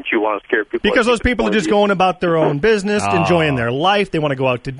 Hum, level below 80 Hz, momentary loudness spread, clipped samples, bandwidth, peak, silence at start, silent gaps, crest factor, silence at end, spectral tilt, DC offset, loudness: none; -36 dBFS; 4 LU; under 0.1%; 11 kHz; -2 dBFS; 0 s; none; 14 dB; 0 s; -5.5 dB/octave; under 0.1%; -16 LUFS